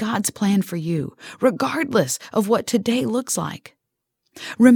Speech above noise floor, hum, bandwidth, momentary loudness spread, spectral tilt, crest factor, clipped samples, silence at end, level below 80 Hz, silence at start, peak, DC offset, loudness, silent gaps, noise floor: 59 dB; none; 19 kHz; 11 LU; -5 dB/octave; 20 dB; under 0.1%; 0 s; -62 dBFS; 0 s; 0 dBFS; under 0.1%; -21 LUFS; none; -79 dBFS